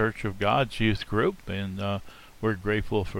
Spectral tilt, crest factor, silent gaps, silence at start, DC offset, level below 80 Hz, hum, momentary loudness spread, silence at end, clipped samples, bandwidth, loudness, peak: -6.5 dB/octave; 18 dB; none; 0 s; under 0.1%; -44 dBFS; none; 8 LU; 0 s; under 0.1%; 16 kHz; -28 LUFS; -10 dBFS